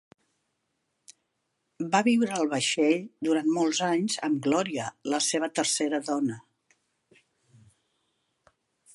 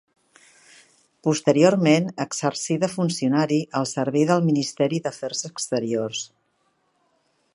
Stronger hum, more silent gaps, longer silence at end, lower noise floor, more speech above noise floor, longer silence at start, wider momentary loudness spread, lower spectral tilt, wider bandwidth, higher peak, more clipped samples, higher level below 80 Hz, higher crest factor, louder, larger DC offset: neither; neither; first, 2.55 s vs 1.3 s; first, -78 dBFS vs -68 dBFS; first, 52 dB vs 47 dB; second, 1.1 s vs 1.25 s; second, 7 LU vs 11 LU; second, -3.5 dB/octave vs -5 dB/octave; about the same, 11.5 kHz vs 11.5 kHz; second, -8 dBFS vs -2 dBFS; neither; second, -78 dBFS vs -70 dBFS; about the same, 22 dB vs 20 dB; second, -26 LUFS vs -22 LUFS; neither